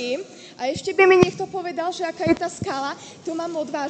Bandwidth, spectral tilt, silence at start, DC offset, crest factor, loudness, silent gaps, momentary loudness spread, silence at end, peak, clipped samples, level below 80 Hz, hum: 9 kHz; -5 dB/octave; 0 s; under 0.1%; 20 dB; -22 LUFS; none; 15 LU; 0 s; -2 dBFS; under 0.1%; -54 dBFS; none